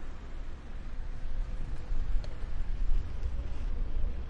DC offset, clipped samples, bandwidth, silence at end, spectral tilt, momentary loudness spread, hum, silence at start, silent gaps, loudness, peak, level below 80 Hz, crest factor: under 0.1%; under 0.1%; 5 kHz; 0 s; -7 dB/octave; 9 LU; none; 0 s; none; -40 LUFS; -16 dBFS; -32 dBFS; 14 dB